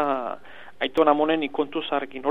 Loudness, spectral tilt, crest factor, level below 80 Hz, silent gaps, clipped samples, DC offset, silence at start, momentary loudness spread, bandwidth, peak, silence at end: -24 LUFS; -6 dB/octave; 20 dB; -64 dBFS; none; under 0.1%; 0.8%; 0 s; 11 LU; 8.8 kHz; -4 dBFS; 0 s